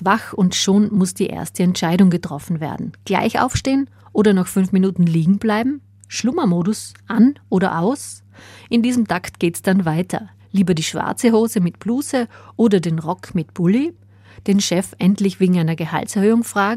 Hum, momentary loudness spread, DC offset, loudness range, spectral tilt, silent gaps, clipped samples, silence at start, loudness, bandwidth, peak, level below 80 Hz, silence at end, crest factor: none; 9 LU; under 0.1%; 2 LU; -6 dB/octave; none; under 0.1%; 0 s; -18 LUFS; 15 kHz; -2 dBFS; -50 dBFS; 0 s; 16 dB